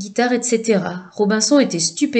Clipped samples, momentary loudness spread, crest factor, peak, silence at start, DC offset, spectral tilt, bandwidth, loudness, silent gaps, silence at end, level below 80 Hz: under 0.1%; 6 LU; 14 dB; -2 dBFS; 0 s; under 0.1%; -3.5 dB/octave; 9.4 kHz; -17 LUFS; none; 0 s; -68 dBFS